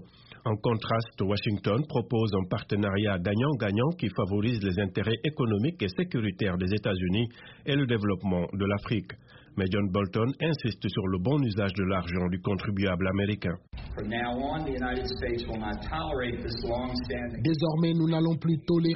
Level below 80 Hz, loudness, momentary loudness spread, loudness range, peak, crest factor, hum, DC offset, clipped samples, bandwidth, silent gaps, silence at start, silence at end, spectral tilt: -48 dBFS; -29 LUFS; 6 LU; 3 LU; -14 dBFS; 14 dB; none; under 0.1%; under 0.1%; 5.8 kHz; none; 0 s; 0 s; -6 dB/octave